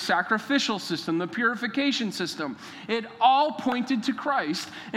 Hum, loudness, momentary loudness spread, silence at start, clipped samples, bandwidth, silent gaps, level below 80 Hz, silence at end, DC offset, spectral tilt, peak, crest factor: none; -26 LUFS; 9 LU; 0 s; under 0.1%; 15.5 kHz; none; -76 dBFS; 0 s; under 0.1%; -4 dB/octave; -8 dBFS; 18 dB